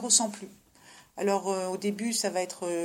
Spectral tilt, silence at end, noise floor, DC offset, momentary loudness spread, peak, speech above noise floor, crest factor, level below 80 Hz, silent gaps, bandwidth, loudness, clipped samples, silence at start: -2.5 dB/octave; 0 s; -55 dBFS; under 0.1%; 20 LU; -8 dBFS; 26 dB; 22 dB; -76 dBFS; none; 16.5 kHz; -29 LUFS; under 0.1%; 0 s